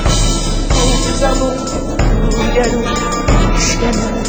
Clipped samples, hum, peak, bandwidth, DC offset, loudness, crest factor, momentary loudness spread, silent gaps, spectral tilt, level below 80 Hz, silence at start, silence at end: under 0.1%; none; 0 dBFS; over 20 kHz; under 0.1%; -15 LUFS; 12 dB; 4 LU; none; -4.5 dB/octave; -16 dBFS; 0 s; 0 s